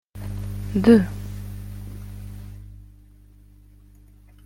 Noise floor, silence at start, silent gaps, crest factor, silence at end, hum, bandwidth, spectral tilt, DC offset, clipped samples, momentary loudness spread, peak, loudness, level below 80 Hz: -50 dBFS; 0.15 s; none; 22 dB; 1.6 s; 50 Hz at -35 dBFS; 16.5 kHz; -8 dB/octave; under 0.1%; under 0.1%; 25 LU; -2 dBFS; -21 LUFS; -40 dBFS